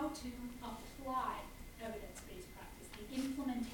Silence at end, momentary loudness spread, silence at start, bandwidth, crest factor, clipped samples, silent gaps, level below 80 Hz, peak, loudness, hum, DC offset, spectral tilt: 0 s; 12 LU; 0 s; 17 kHz; 16 dB; under 0.1%; none; -56 dBFS; -28 dBFS; -45 LUFS; none; under 0.1%; -4.5 dB/octave